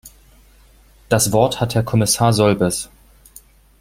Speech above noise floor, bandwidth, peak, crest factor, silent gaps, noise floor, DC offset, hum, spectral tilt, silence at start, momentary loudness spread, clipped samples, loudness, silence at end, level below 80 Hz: 33 dB; 16.5 kHz; -2 dBFS; 18 dB; none; -49 dBFS; under 0.1%; none; -4.5 dB/octave; 0.05 s; 6 LU; under 0.1%; -17 LUFS; 0.95 s; -44 dBFS